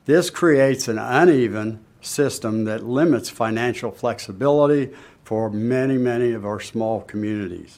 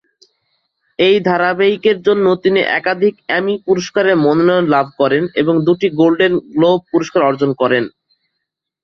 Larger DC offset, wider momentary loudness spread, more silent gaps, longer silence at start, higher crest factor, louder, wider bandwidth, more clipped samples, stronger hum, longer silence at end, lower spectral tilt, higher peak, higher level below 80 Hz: neither; first, 11 LU vs 5 LU; neither; second, 0.05 s vs 1 s; about the same, 18 dB vs 14 dB; second, -21 LUFS vs -14 LUFS; first, 16 kHz vs 6.8 kHz; neither; neither; second, 0.1 s vs 0.95 s; about the same, -5.5 dB/octave vs -6 dB/octave; about the same, -2 dBFS vs -2 dBFS; about the same, -60 dBFS vs -58 dBFS